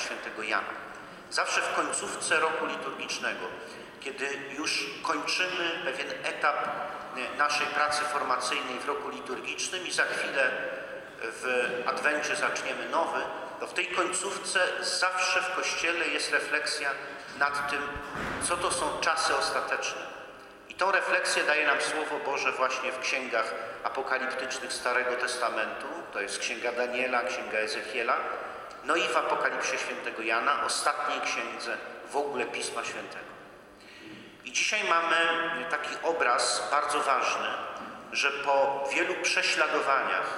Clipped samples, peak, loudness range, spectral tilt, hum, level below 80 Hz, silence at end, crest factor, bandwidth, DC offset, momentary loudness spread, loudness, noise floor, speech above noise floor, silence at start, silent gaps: under 0.1%; -12 dBFS; 4 LU; -1 dB/octave; none; -64 dBFS; 0 s; 18 dB; 16 kHz; under 0.1%; 11 LU; -29 LUFS; -50 dBFS; 21 dB; 0 s; none